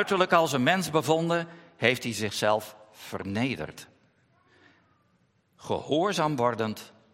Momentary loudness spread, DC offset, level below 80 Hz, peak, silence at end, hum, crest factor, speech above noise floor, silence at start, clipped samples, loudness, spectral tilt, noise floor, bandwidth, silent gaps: 18 LU; under 0.1%; -68 dBFS; -6 dBFS; 0.25 s; none; 24 dB; 41 dB; 0 s; under 0.1%; -27 LUFS; -4.5 dB/octave; -68 dBFS; 16.5 kHz; none